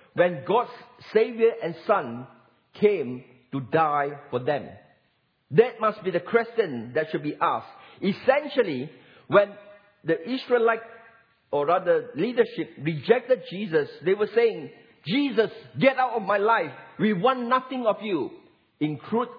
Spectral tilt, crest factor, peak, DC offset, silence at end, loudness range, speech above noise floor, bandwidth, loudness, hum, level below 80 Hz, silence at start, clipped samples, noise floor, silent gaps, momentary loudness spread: -8.5 dB/octave; 20 dB; -4 dBFS; under 0.1%; 0 s; 2 LU; 45 dB; 5.2 kHz; -25 LUFS; none; -76 dBFS; 0.15 s; under 0.1%; -69 dBFS; none; 10 LU